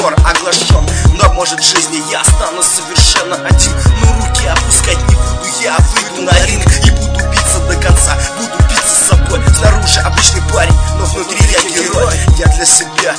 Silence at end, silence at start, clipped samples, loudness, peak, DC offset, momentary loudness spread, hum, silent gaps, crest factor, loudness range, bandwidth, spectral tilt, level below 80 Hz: 0 s; 0 s; 1%; -9 LUFS; 0 dBFS; under 0.1%; 5 LU; none; none; 10 dB; 1 LU; 11 kHz; -3 dB/octave; -12 dBFS